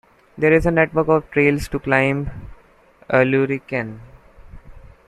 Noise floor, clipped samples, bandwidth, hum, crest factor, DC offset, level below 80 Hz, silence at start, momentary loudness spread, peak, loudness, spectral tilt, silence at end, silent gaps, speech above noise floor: -52 dBFS; under 0.1%; 13.5 kHz; none; 18 dB; under 0.1%; -40 dBFS; 0.35 s; 10 LU; -2 dBFS; -18 LUFS; -7.5 dB/octave; 0.3 s; none; 34 dB